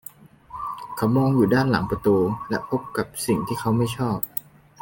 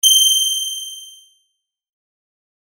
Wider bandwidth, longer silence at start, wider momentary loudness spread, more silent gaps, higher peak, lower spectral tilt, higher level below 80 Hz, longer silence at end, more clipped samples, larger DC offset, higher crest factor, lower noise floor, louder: second, 17 kHz vs over 20 kHz; first, 0.5 s vs 0.05 s; second, 13 LU vs 21 LU; neither; second, -6 dBFS vs 0 dBFS; first, -6.5 dB/octave vs 6 dB/octave; first, -50 dBFS vs -64 dBFS; second, 0.4 s vs 1.6 s; neither; neither; about the same, 18 dB vs 20 dB; second, -45 dBFS vs -72 dBFS; second, -23 LUFS vs -14 LUFS